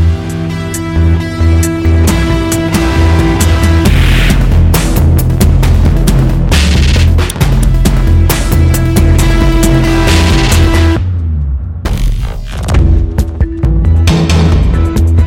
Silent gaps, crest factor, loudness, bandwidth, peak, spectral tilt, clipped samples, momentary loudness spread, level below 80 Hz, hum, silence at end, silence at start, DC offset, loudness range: none; 8 dB; -10 LUFS; 17 kHz; 0 dBFS; -6 dB/octave; under 0.1%; 7 LU; -12 dBFS; none; 0 s; 0 s; under 0.1%; 3 LU